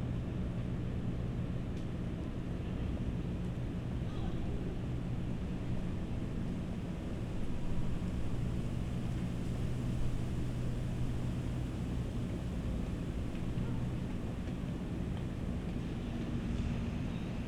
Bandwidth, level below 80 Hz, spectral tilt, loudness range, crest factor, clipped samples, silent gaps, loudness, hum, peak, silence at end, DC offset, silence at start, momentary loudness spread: 12 kHz; -42 dBFS; -8 dB/octave; 1 LU; 12 dB; under 0.1%; none; -39 LUFS; none; -24 dBFS; 0 s; under 0.1%; 0 s; 2 LU